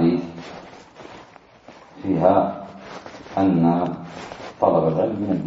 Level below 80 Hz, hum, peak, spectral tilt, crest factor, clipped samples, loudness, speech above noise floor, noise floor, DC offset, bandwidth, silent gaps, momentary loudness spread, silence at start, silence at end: -56 dBFS; none; -2 dBFS; -8.5 dB/octave; 20 dB; under 0.1%; -21 LUFS; 28 dB; -47 dBFS; under 0.1%; 7.8 kHz; none; 23 LU; 0 s; 0 s